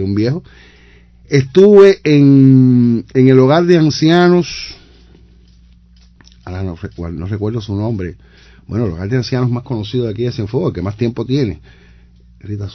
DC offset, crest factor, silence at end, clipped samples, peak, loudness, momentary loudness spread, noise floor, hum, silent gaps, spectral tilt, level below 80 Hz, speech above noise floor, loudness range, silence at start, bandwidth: under 0.1%; 14 dB; 0 s; 0.5%; 0 dBFS; -12 LUFS; 17 LU; -45 dBFS; none; none; -7.5 dB/octave; -38 dBFS; 33 dB; 15 LU; 0 s; 6.8 kHz